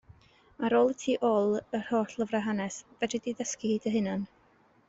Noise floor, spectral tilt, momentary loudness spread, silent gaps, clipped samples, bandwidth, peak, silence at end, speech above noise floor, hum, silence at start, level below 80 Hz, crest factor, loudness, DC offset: -64 dBFS; -5 dB/octave; 9 LU; none; under 0.1%; 8 kHz; -14 dBFS; 0.6 s; 35 dB; none; 0.6 s; -68 dBFS; 18 dB; -30 LUFS; under 0.1%